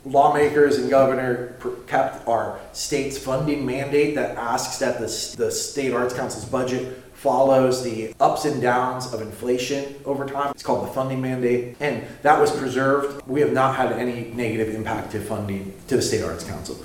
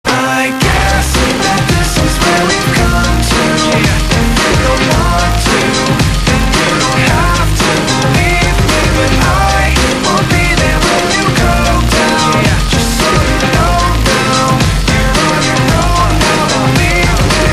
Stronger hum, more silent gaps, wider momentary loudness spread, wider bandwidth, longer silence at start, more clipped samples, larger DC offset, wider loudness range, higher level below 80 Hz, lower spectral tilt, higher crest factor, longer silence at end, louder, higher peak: neither; neither; first, 11 LU vs 1 LU; about the same, 17 kHz vs 15.5 kHz; about the same, 0.05 s vs 0.05 s; second, under 0.1% vs 0.1%; neither; first, 3 LU vs 0 LU; second, -52 dBFS vs -16 dBFS; about the same, -5 dB/octave vs -4 dB/octave; first, 22 dB vs 10 dB; about the same, 0 s vs 0 s; second, -22 LUFS vs -10 LUFS; about the same, 0 dBFS vs 0 dBFS